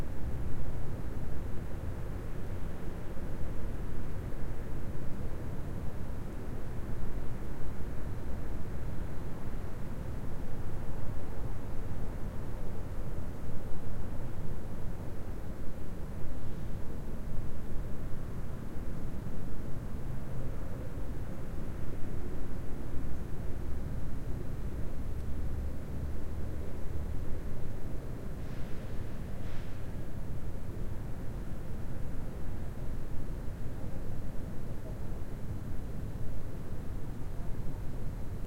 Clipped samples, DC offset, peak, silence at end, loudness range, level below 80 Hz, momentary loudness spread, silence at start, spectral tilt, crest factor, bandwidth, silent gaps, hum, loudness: under 0.1%; under 0.1%; -16 dBFS; 0 s; 2 LU; -40 dBFS; 2 LU; 0 s; -7.5 dB/octave; 12 dB; 4.7 kHz; none; none; -42 LUFS